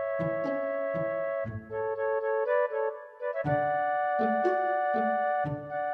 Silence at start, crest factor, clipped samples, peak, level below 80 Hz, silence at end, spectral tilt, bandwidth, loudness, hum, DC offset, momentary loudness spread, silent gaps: 0 s; 14 dB; under 0.1%; -16 dBFS; -64 dBFS; 0 s; -9 dB/octave; 5.8 kHz; -30 LUFS; none; under 0.1%; 7 LU; none